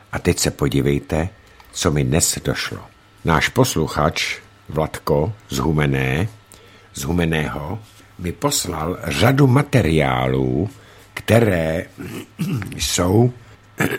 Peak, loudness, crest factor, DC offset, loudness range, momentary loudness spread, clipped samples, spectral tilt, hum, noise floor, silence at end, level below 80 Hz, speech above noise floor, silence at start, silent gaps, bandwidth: 0 dBFS; -19 LUFS; 20 dB; under 0.1%; 4 LU; 13 LU; under 0.1%; -5 dB/octave; none; -46 dBFS; 0 s; -36 dBFS; 27 dB; 0.1 s; none; 16.5 kHz